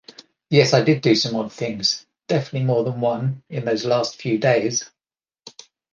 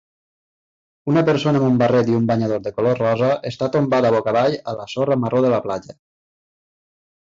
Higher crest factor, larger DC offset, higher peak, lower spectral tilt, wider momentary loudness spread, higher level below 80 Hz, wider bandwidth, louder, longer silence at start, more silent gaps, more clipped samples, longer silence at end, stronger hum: first, 20 dB vs 14 dB; neither; first, -2 dBFS vs -6 dBFS; second, -5 dB/octave vs -7.5 dB/octave; first, 10 LU vs 7 LU; second, -64 dBFS vs -56 dBFS; about the same, 7.6 kHz vs 7.6 kHz; about the same, -20 LUFS vs -19 LUFS; second, 0.5 s vs 1.05 s; neither; neither; second, 0.45 s vs 1.3 s; neither